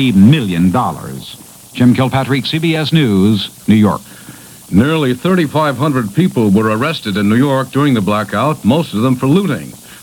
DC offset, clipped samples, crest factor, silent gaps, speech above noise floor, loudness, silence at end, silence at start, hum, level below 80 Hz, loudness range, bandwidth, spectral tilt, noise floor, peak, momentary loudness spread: under 0.1%; under 0.1%; 12 dB; none; 23 dB; -13 LUFS; 0.05 s; 0 s; none; -46 dBFS; 1 LU; 18.5 kHz; -6.5 dB/octave; -35 dBFS; 0 dBFS; 13 LU